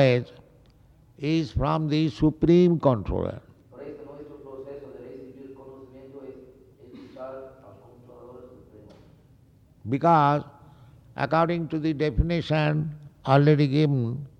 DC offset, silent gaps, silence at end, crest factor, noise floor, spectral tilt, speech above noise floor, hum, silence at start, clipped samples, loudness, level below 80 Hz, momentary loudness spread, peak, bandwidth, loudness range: under 0.1%; none; 0.1 s; 20 dB; -56 dBFS; -8.5 dB/octave; 34 dB; none; 0 s; under 0.1%; -23 LUFS; -44 dBFS; 25 LU; -6 dBFS; 6.8 kHz; 21 LU